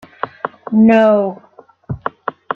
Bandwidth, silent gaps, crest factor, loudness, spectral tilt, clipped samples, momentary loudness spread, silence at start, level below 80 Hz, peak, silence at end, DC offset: 5.2 kHz; none; 14 dB; -14 LUFS; -8.5 dB/octave; under 0.1%; 18 LU; 0.25 s; -50 dBFS; -2 dBFS; 0 s; under 0.1%